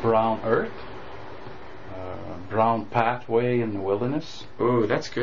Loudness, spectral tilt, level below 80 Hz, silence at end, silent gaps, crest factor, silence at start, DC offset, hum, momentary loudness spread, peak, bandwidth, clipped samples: -25 LUFS; -5.5 dB/octave; -54 dBFS; 0 s; none; 20 dB; 0 s; 1%; none; 18 LU; -6 dBFS; 7.4 kHz; under 0.1%